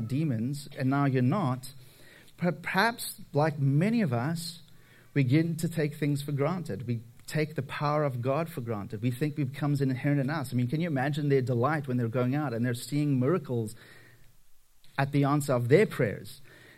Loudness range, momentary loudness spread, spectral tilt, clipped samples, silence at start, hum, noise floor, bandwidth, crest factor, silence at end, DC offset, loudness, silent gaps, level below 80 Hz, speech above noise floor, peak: 3 LU; 9 LU; -7 dB/octave; under 0.1%; 0 s; none; -54 dBFS; 15.5 kHz; 22 dB; 0.3 s; under 0.1%; -29 LUFS; none; -66 dBFS; 26 dB; -8 dBFS